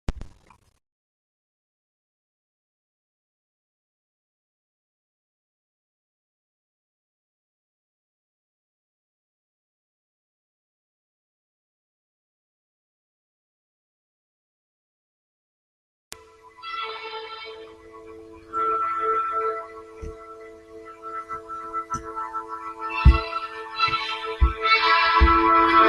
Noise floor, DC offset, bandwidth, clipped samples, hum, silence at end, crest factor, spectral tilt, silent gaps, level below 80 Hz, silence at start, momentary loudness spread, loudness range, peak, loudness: -56 dBFS; under 0.1%; 11 kHz; under 0.1%; none; 0 s; 24 dB; -5.5 dB/octave; 0.92-16.11 s; -34 dBFS; 0.1 s; 26 LU; 17 LU; -4 dBFS; -23 LUFS